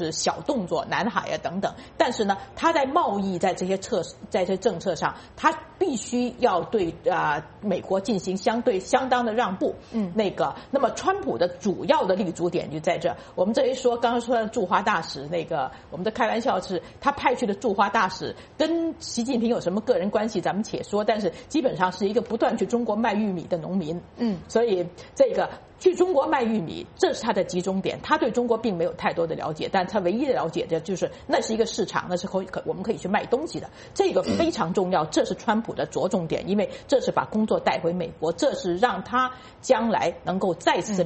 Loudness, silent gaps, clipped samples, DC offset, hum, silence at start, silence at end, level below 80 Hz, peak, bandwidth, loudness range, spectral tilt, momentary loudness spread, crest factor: -25 LUFS; none; under 0.1%; under 0.1%; none; 0 s; 0 s; -56 dBFS; -4 dBFS; 8.8 kHz; 1 LU; -5 dB/octave; 6 LU; 20 dB